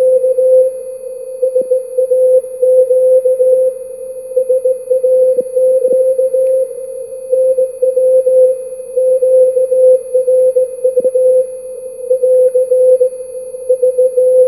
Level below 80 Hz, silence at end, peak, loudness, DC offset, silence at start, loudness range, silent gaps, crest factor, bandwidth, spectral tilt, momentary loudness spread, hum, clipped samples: -62 dBFS; 0 s; 0 dBFS; -12 LUFS; 0.1%; 0 s; 2 LU; none; 10 dB; 12 kHz; -5 dB/octave; 15 LU; none; under 0.1%